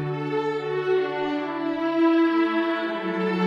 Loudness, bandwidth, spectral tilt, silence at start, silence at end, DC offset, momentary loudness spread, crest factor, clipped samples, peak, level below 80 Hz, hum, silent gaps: -24 LUFS; 7 kHz; -7.5 dB/octave; 0 s; 0 s; under 0.1%; 7 LU; 12 dB; under 0.1%; -10 dBFS; -68 dBFS; none; none